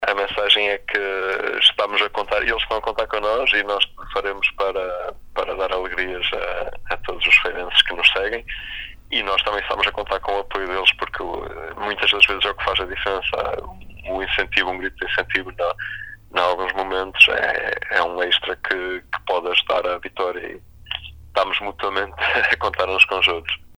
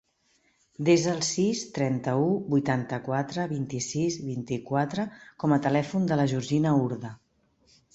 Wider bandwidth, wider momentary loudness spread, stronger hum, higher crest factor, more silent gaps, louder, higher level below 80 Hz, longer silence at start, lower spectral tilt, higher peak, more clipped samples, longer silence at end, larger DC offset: first, over 20 kHz vs 8.2 kHz; first, 14 LU vs 9 LU; neither; about the same, 22 dB vs 18 dB; neither; first, -19 LUFS vs -27 LUFS; first, -42 dBFS vs -64 dBFS; second, 0 s vs 0.8 s; second, -3 dB/octave vs -5.5 dB/octave; first, 0 dBFS vs -8 dBFS; neither; second, 0.05 s vs 0.8 s; neither